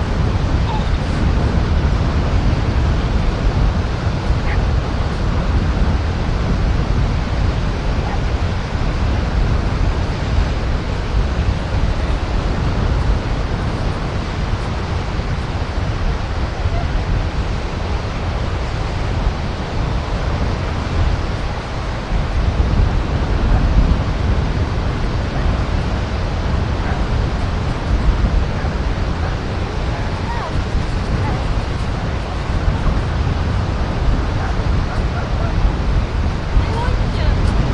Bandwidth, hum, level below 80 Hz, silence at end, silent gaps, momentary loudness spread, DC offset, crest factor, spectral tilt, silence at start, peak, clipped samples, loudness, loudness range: 9.4 kHz; none; -20 dBFS; 0 s; none; 4 LU; under 0.1%; 14 dB; -7 dB/octave; 0 s; -2 dBFS; under 0.1%; -20 LUFS; 3 LU